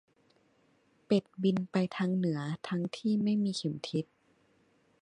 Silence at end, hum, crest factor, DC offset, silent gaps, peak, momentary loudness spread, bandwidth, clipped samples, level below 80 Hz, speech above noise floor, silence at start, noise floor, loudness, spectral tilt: 1 s; none; 18 dB; under 0.1%; none; -14 dBFS; 7 LU; 10.5 kHz; under 0.1%; -76 dBFS; 38 dB; 1.1 s; -69 dBFS; -32 LUFS; -7 dB/octave